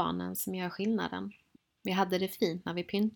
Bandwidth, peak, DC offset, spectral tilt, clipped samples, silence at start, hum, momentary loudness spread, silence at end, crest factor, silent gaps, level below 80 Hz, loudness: 19 kHz; -14 dBFS; under 0.1%; -5 dB/octave; under 0.1%; 0 s; none; 9 LU; 0 s; 20 dB; none; -68 dBFS; -33 LUFS